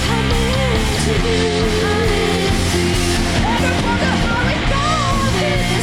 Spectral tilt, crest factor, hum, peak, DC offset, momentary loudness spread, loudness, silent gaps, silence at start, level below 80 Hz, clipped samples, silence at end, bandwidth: -4.5 dB/octave; 10 dB; none; -6 dBFS; under 0.1%; 1 LU; -16 LUFS; none; 0 s; -24 dBFS; under 0.1%; 0 s; 17 kHz